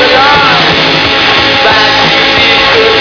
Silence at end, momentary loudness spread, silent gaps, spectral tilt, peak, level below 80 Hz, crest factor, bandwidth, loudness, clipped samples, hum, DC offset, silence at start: 0 s; 2 LU; none; -3.5 dB/octave; 0 dBFS; -32 dBFS; 6 dB; 5.4 kHz; -4 LUFS; 1%; none; under 0.1%; 0 s